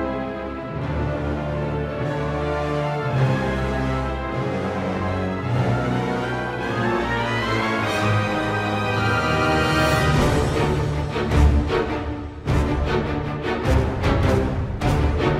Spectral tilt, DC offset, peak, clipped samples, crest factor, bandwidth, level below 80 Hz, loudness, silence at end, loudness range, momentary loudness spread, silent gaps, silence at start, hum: -6.5 dB/octave; under 0.1%; -4 dBFS; under 0.1%; 18 dB; 15 kHz; -30 dBFS; -22 LUFS; 0 s; 4 LU; 7 LU; none; 0 s; none